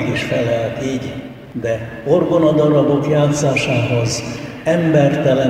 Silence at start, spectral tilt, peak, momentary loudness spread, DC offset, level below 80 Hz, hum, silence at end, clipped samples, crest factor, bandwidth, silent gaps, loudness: 0 s; -6 dB/octave; -2 dBFS; 11 LU; under 0.1%; -46 dBFS; none; 0 s; under 0.1%; 14 dB; 14 kHz; none; -16 LUFS